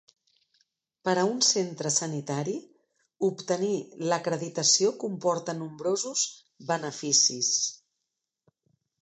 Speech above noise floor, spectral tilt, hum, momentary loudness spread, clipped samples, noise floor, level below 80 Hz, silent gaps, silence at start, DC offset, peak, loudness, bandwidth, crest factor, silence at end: 57 dB; -2.5 dB/octave; none; 10 LU; under 0.1%; -84 dBFS; -80 dBFS; none; 1.05 s; under 0.1%; -10 dBFS; -27 LUFS; 10 kHz; 20 dB; 1.25 s